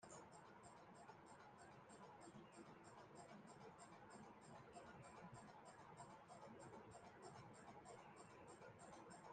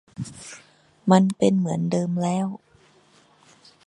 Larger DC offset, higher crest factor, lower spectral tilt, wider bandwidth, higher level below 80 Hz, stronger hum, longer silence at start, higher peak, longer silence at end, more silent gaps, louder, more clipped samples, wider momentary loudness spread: neither; second, 16 dB vs 22 dB; second, -4.5 dB/octave vs -7 dB/octave; second, 9.6 kHz vs 11 kHz; second, -86 dBFS vs -64 dBFS; neither; second, 0 s vs 0.2 s; second, -48 dBFS vs -2 dBFS; second, 0 s vs 1.3 s; neither; second, -63 LUFS vs -22 LUFS; neither; second, 3 LU vs 22 LU